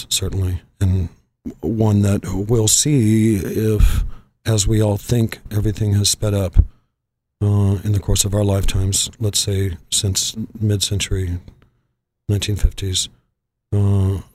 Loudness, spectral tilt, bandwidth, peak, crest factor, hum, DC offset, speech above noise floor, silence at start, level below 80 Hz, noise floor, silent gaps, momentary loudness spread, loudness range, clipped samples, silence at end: -19 LUFS; -4.5 dB/octave; 15.5 kHz; 0 dBFS; 18 dB; none; under 0.1%; 59 dB; 0 s; -26 dBFS; -76 dBFS; none; 9 LU; 5 LU; under 0.1%; 0.1 s